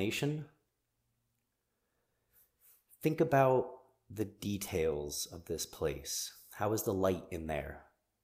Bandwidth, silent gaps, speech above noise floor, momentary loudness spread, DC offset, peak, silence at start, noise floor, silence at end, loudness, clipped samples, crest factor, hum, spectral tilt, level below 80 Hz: 15.5 kHz; none; 49 dB; 14 LU; under 0.1%; -16 dBFS; 0 s; -83 dBFS; 0.4 s; -35 LUFS; under 0.1%; 22 dB; none; -5 dB/octave; -58 dBFS